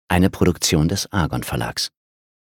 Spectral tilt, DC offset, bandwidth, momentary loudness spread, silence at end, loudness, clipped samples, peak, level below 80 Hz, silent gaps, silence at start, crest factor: -4.5 dB/octave; under 0.1%; 18.5 kHz; 8 LU; 0.6 s; -20 LUFS; under 0.1%; -2 dBFS; -36 dBFS; none; 0.1 s; 20 dB